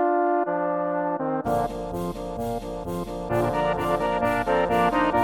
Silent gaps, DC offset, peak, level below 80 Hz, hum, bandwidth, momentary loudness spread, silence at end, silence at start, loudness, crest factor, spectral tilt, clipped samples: none; under 0.1%; -10 dBFS; -44 dBFS; none; 17 kHz; 10 LU; 0 s; 0 s; -25 LUFS; 14 dB; -6.5 dB/octave; under 0.1%